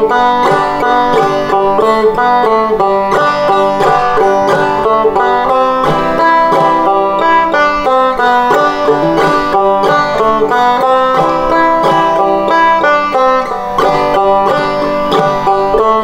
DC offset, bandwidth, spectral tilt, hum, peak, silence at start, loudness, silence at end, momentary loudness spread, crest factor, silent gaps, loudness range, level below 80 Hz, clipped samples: under 0.1%; 16 kHz; -5.5 dB/octave; none; 0 dBFS; 0 s; -10 LUFS; 0 s; 2 LU; 10 dB; none; 1 LU; -36 dBFS; under 0.1%